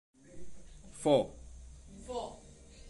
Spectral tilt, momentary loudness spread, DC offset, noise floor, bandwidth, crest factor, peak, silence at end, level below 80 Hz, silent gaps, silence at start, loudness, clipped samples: -5.5 dB/octave; 27 LU; under 0.1%; -54 dBFS; 11.5 kHz; 22 dB; -14 dBFS; 0 s; -54 dBFS; none; 0.3 s; -34 LUFS; under 0.1%